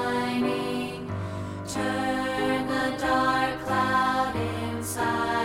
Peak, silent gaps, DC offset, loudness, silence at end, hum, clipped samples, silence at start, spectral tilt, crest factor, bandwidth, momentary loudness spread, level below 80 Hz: -12 dBFS; none; under 0.1%; -27 LUFS; 0 s; none; under 0.1%; 0 s; -5 dB/octave; 16 dB; 17 kHz; 9 LU; -52 dBFS